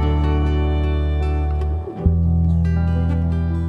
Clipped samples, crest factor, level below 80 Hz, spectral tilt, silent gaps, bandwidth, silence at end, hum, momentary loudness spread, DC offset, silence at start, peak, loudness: under 0.1%; 14 dB; -22 dBFS; -9.5 dB/octave; none; 4.7 kHz; 0 s; none; 4 LU; under 0.1%; 0 s; -4 dBFS; -20 LUFS